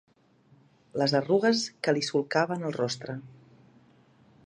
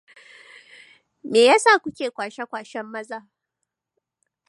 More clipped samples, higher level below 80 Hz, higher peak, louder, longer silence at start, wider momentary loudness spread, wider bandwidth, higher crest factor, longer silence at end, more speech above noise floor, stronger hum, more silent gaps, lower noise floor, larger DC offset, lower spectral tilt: neither; about the same, -74 dBFS vs -74 dBFS; second, -10 dBFS vs -4 dBFS; second, -27 LUFS vs -19 LUFS; second, 0.95 s vs 1.25 s; second, 13 LU vs 21 LU; about the same, 10.5 kHz vs 11.5 kHz; about the same, 20 dB vs 20 dB; second, 1.15 s vs 1.3 s; second, 35 dB vs 61 dB; neither; neither; second, -62 dBFS vs -81 dBFS; neither; first, -4.5 dB/octave vs -2 dB/octave